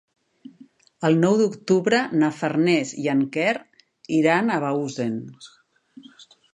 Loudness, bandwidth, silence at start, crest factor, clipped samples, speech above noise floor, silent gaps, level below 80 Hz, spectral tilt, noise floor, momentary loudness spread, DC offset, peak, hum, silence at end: -22 LUFS; 11 kHz; 1 s; 18 dB; under 0.1%; 31 dB; none; -70 dBFS; -6 dB/octave; -52 dBFS; 9 LU; under 0.1%; -4 dBFS; none; 0.3 s